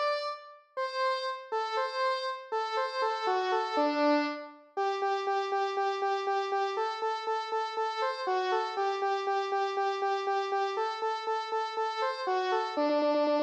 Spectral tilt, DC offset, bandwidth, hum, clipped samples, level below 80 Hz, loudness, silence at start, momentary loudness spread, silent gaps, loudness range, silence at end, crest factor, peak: -1.5 dB/octave; under 0.1%; 9.4 kHz; none; under 0.1%; under -90 dBFS; -31 LUFS; 0 s; 6 LU; none; 1 LU; 0 s; 12 dB; -18 dBFS